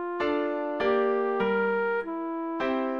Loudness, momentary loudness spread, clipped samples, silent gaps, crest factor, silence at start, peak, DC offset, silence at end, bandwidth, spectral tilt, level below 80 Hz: -27 LUFS; 6 LU; under 0.1%; none; 14 dB; 0 s; -14 dBFS; under 0.1%; 0 s; 6.6 kHz; -7.5 dB/octave; -62 dBFS